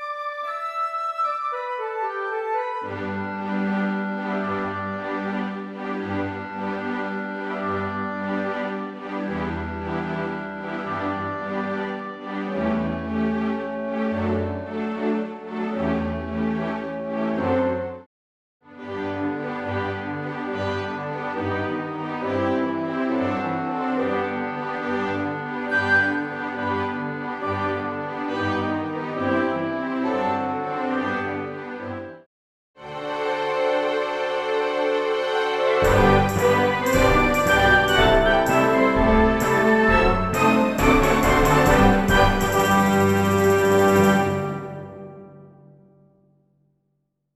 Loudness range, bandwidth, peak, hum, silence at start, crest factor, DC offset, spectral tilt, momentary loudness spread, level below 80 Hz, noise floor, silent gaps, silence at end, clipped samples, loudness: 10 LU; 14.5 kHz; -4 dBFS; none; 0 s; 20 dB; under 0.1%; -5.5 dB/octave; 12 LU; -36 dBFS; -73 dBFS; 18.06-18.60 s, 32.26-32.74 s; 1.85 s; under 0.1%; -23 LUFS